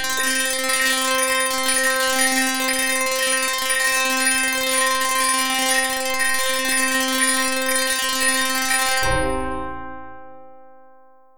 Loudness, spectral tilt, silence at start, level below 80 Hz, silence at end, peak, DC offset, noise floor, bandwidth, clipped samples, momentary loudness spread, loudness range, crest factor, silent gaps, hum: -18 LUFS; -0.5 dB/octave; 0 s; -44 dBFS; 0 s; -6 dBFS; 1%; -52 dBFS; 19 kHz; under 0.1%; 3 LU; 3 LU; 16 dB; none; none